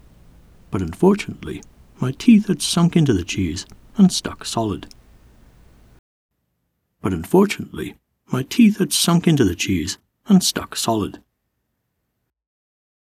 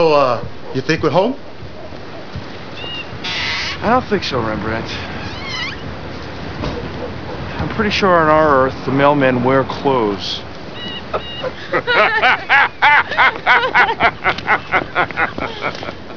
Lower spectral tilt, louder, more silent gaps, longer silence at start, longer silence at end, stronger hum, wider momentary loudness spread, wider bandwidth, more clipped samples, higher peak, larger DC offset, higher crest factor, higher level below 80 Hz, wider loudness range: about the same, -5 dB/octave vs -5.5 dB/octave; second, -19 LUFS vs -16 LUFS; first, 5.99-6.29 s vs none; first, 0.7 s vs 0 s; first, 1.9 s vs 0 s; neither; about the same, 15 LU vs 17 LU; first, 15.5 kHz vs 5.4 kHz; neither; about the same, -2 dBFS vs 0 dBFS; second, under 0.1% vs 2%; about the same, 20 dB vs 18 dB; second, -46 dBFS vs -40 dBFS; about the same, 7 LU vs 9 LU